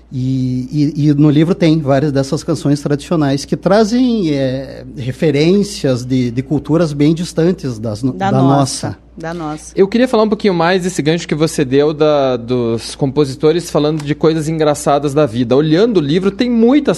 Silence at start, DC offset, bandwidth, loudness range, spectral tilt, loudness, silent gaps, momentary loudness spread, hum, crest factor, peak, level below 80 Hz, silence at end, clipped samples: 0.1 s; under 0.1%; 12.5 kHz; 2 LU; -6.5 dB/octave; -14 LUFS; none; 8 LU; none; 14 dB; 0 dBFS; -42 dBFS; 0 s; under 0.1%